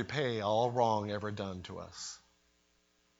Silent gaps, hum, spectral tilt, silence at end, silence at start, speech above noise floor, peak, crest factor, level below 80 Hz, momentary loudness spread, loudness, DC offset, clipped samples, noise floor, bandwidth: none; none; -5 dB/octave; 1.05 s; 0 s; 38 dB; -16 dBFS; 20 dB; -70 dBFS; 15 LU; -34 LUFS; under 0.1%; under 0.1%; -73 dBFS; 8 kHz